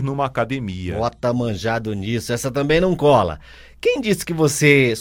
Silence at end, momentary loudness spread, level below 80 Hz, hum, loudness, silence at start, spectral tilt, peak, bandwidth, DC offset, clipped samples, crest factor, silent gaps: 0 s; 10 LU; -42 dBFS; none; -19 LUFS; 0 s; -5 dB/octave; 0 dBFS; 17 kHz; under 0.1%; under 0.1%; 18 dB; none